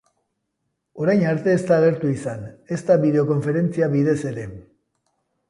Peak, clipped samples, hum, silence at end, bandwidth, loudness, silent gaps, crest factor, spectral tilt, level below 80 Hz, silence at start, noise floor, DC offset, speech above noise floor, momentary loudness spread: -4 dBFS; under 0.1%; none; 0.9 s; 11 kHz; -20 LUFS; none; 16 dB; -8 dB/octave; -58 dBFS; 0.95 s; -76 dBFS; under 0.1%; 56 dB; 13 LU